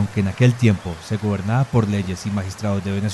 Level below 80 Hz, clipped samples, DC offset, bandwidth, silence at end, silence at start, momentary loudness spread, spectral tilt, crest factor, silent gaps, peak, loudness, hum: -40 dBFS; under 0.1%; under 0.1%; 12.5 kHz; 0 s; 0 s; 8 LU; -7 dB/octave; 16 dB; none; -4 dBFS; -21 LUFS; none